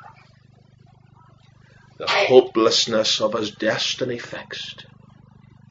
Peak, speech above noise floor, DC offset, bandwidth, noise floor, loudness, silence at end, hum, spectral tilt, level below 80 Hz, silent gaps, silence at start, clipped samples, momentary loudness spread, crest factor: 0 dBFS; 32 dB; under 0.1%; 8 kHz; -52 dBFS; -20 LUFS; 0.9 s; 50 Hz at -60 dBFS; -3 dB/octave; -64 dBFS; none; 0.05 s; under 0.1%; 17 LU; 24 dB